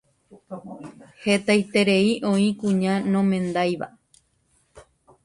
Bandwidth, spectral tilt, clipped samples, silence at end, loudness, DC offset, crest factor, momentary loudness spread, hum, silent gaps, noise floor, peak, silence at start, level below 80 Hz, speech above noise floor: 11.5 kHz; -6 dB/octave; under 0.1%; 0.45 s; -22 LUFS; under 0.1%; 16 dB; 20 LU; none; none; -66 dBFS; -8 dBFS; 0.5 s; -62 dBFS; 44 dB